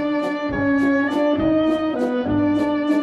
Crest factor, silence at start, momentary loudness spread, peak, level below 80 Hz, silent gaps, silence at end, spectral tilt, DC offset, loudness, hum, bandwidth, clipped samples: 10 dB; 0 s; 4 LU; -8 dBFS; -46 dBFS; none; 0 s; -7 dB/octave; under 0.1%; -20 LUFS; none; 8 kHz; under 0.1%